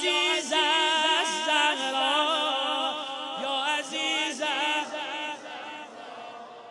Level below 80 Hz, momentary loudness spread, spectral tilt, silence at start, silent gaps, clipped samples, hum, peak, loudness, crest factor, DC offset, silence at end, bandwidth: -86 dBFS; 18 LU; 0 dB/octave; 0 s; none; under 0.1%; none; -10 dBFS; -25 LUFS; 18 dB; under 0.1%; 0 s; 11.5 kHz